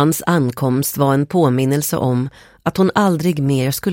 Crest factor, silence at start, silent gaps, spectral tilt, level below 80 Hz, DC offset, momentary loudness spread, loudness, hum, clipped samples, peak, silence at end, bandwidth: 14 dB; 0 s; none; -6 dB/octave; -50 dBFS; under 0.1%; 5 LU; -17 LUFS; none; under 0.1%; -2 dBFS; 0 s; 17 kHz